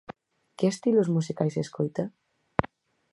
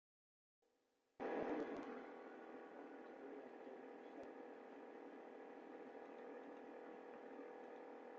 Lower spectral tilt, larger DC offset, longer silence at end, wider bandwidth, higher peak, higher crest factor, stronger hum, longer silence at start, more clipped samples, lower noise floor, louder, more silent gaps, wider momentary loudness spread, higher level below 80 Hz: first, -7 dB/octave vs -4 dB/octave; neither; first, 0.45 s vs 0 s; first, 11.5 kHz vs 7.4 kHz; first, -2 dBFS vs -34 dBFS; first, 28 dB vs 20 dB; neither; second, 0.6 s vs 1.2 s; neither; second, -49 dBFS vs -85 dBFS; first, -28 LUFS vs -54 LUFS; neither; about the same, 13 LU vs 11 LU; first, -56 dBFS vs -90 dBFS